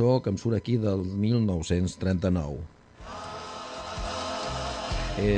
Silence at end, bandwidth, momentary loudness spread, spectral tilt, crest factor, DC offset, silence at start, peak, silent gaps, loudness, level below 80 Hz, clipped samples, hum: 0 s; 9.6 kHz; 13 LU; -6.5 dB/octave; 16 dB; under 0.1%; 0 s; -10 dBFS; none; -29 LUFS; -42 dBFS; under 0.1%; none